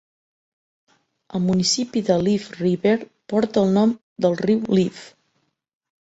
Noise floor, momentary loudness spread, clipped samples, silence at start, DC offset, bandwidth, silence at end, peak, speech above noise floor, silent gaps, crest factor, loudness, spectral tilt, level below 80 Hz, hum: -70 dBFS; 6 LU; under 0.1%; 1.35 s; under 0.1%; 8 kHz; 0.95 s; -4 dBFS; 51 dB; 4.03-4.16 s; 18 dB; -21 LUFS; -5.5 dB/octave; -58 dBFS; none